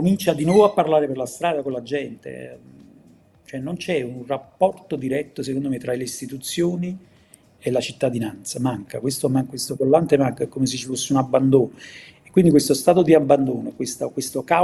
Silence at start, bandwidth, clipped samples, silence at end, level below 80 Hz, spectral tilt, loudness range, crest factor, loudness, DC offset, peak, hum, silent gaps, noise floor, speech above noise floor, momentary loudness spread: 0 s; 13.5 kHz; under 0.1%; 0 s; -58 dBFS; -5.5 dB/octave; 9 LU; 20 dB; -21 LUFS; under 0.1%; 0 dBFS; none; none; -53 dBFS; 32 dB; 14 LU